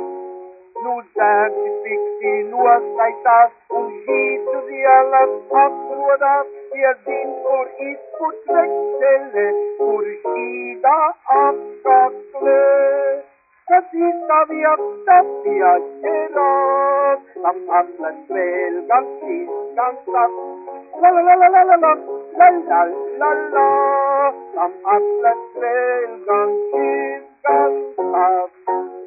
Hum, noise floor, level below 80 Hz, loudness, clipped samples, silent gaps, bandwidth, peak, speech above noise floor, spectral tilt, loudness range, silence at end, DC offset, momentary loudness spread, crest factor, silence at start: none; -36 dBFS; -76 dBFS; -17 LUFS; under 0.1%; none; 2.7 kHz; 0 dBFS; 20 dB; -10 dB/octave; 5 LU; 0 s; under 0.1%; 12 LU; 16 dB; 0 s